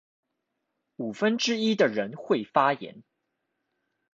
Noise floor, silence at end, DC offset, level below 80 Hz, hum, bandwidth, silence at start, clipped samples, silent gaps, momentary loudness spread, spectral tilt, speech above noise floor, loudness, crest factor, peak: -81 dBFS; 1.15 s; under 0.1%; -76 dBFS; none; 7.8 kHz; 1 s; under 0.1%; none; 13 LU; -4 dB/octave; 55 dB; -26 LUFS; 22 dB; -6 dBFS